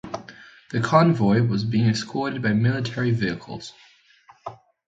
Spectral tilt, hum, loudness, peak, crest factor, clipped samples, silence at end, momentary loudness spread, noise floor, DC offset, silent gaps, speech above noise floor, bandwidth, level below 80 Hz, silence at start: -7 dB/octave; none; -22 LUFS; -2 dBFS; 22 dB; under 0.1%; 0.35 s; 22 LU; -55 dBFS; under 0.1%; none; 33 dB; 8 kHz; -56 dBFS; 0.05 s